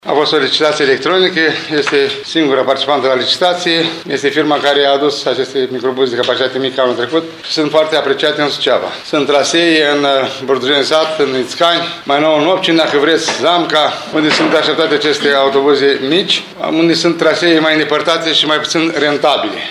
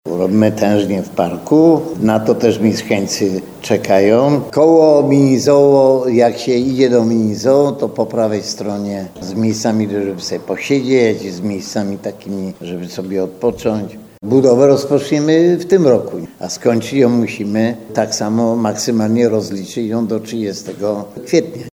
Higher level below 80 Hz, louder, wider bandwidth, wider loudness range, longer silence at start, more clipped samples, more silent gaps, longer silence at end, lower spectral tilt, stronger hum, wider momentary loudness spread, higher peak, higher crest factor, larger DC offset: second, -60 dBFS vs -54 dBFS; about the same, -12 LUFS vs -14 LUFS; second, 13.5 kHz vs 18.5 kHz; second, 2 LU vs 7 LU; about the same, 0.05 s vs 0.05 s; neither; neither; about the same, 0 s vs 0.05 s; second, -3.5 dB/octave vs -6 dB/octave; neither; second, 5 LU vs 12 LU; about the same, 0 dBFS vs 0 dBFS; about the same, 12 dB vs 14 dB; neither